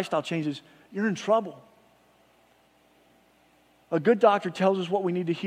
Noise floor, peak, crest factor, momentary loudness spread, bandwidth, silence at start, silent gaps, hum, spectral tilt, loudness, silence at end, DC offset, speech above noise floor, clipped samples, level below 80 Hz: -62 dBFS; -6 dBFS; 22 dB; 13 LU; 12 kHz; 0 s; none; 60 Hz at -65 dBFS; -6.5 dB/octave; -26 LUFS; 0 s; under 0.1%; 37 dB; under 0.1%; -78 dBFS